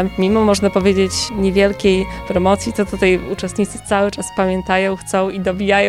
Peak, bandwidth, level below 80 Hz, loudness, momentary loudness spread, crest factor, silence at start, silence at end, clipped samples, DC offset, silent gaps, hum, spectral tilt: -2 dBFS; 14 kHz; -36 dBFS; -17 LUFS; 6 LU; 14 dB; 0 s; 0 s; under 0.1%; 0.2%; none; none; -5 dB/octave